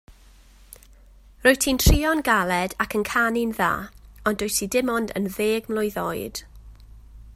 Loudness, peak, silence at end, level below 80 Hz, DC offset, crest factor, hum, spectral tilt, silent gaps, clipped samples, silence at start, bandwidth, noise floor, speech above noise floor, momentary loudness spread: -23 LUFS; -2 dBFS; 0 s; -32 dBFS; under 0.1%; 22 dB; none; -4 dB/octave; none; under 0.1%; 0.1 s; 16 kHz; -51 dBFS; 28 dB; 10 LU